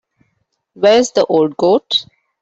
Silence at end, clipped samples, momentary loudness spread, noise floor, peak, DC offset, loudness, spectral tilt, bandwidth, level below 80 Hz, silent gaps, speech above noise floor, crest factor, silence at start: 0.4 s; under 0.1%; 5 LU; -67 dBFS; -2 dBFS; under 0.1%; -14 LUFS; -4 dB/octave; 8 kHz; -58 dBFS; none; 54 dB; 14 dB; 0.8 s